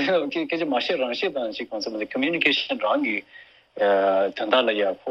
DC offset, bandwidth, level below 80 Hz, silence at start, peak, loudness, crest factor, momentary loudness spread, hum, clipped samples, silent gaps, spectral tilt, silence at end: under 0.1%; 7.4 kHz; -68 dBFS; 0 s; -4 dBFS; -23 LUFS; 20 dB; 9 LU; none; under 0.1%; none; -4.5 dB/octave; 0 s